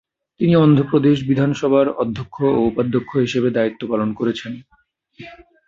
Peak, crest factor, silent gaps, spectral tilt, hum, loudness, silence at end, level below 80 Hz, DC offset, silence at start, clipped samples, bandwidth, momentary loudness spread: -2 dBFS; 16 dB; none; -8 dB/octave; none; -18 LUFS; 0.35 s; -52 dBFS; under 0.1%; 0.4 s; under 0.1%; 7.6 kHz; 9 LU